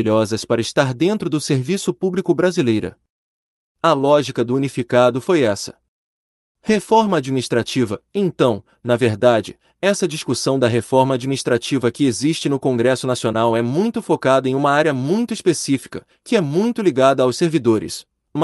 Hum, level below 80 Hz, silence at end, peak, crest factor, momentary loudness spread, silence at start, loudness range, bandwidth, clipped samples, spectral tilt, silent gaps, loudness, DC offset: none; -58 dBFS; 0 s; -2 dBFS; 16 dB; 6 LU; 0 s; 2 LU; 12 kHz; under 0.1%; -5.5 dB/octave; 3.10-3.75 s, 5.88-6.55 s; -18 LUFS; under 0.1%